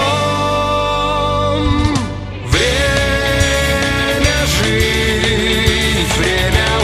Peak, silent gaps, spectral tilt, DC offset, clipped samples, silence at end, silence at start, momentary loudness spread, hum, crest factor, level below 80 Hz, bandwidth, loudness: 0 dBFS; none; -4 dB/octave; under 0.1%; under 0.1%; 0 s; 0 s; 2 LU; none; 14 dB; -22 dBFS; 15.5 kHz; -14 LUFS